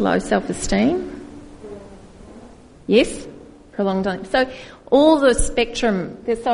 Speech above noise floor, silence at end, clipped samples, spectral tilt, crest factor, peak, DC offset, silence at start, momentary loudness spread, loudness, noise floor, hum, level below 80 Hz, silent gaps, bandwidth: 25 dB; 0 s; under 0.1%; -4.5 dB/octave; 18 dB; -2 dBFS; 0.1%; 0 s; 23 LU; -19 LUFS; -43 dBFS; none; -36 dBFS; none; 11 kHz